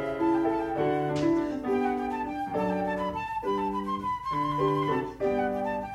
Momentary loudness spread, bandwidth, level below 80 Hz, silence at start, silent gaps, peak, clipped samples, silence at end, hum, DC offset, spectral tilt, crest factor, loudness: 5 LU; 12.5 kHz; -54 dBFS; 0 s; none; -14 dBFS; under 0.1%; 0 s; none; under 0.1%; -7.5 dB/octave; 14 dB; -29 LUFS